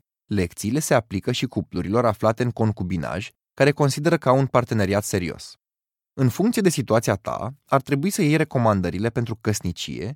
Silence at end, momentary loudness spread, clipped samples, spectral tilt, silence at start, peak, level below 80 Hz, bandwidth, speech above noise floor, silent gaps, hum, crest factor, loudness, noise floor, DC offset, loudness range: 0 s; 10 LU; under 0.1%; -6 dB/octave; 0.3 s; -2 dBFS; -52 dBFS; 17 kHz; over 68 dB; none; none; 20 dB; -22 LUFS; under -90 dBFS; under 0.1%; 2 LU